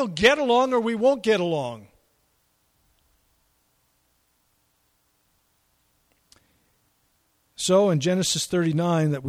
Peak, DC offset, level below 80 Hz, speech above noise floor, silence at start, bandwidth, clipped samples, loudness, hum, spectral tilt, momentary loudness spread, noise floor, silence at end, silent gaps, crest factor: -4 dBFS; under 0.1%; -58 dBFS; 47 dB; 0 s; 15.5 kHz; under 0.1%; -22 LUFS; none; -4.5 dB/octave; 9 LU; -68 dBFS; 0 s; none; 22 dB